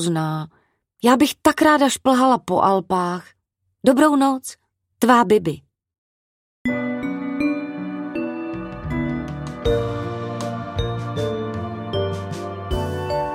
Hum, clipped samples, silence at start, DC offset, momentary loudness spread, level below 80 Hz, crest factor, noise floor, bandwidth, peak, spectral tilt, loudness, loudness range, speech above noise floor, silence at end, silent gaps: none; under 0.1%; 0 s; under 0.1%; 14 LU; -40 dBFS; 20 dB; -72 dBFS; 16.5 kHz; 0 dBFS; -5.5 dB/octave; -21 LUFS; 8 LU; 55 dB; 0 s; 5.98-6.65 s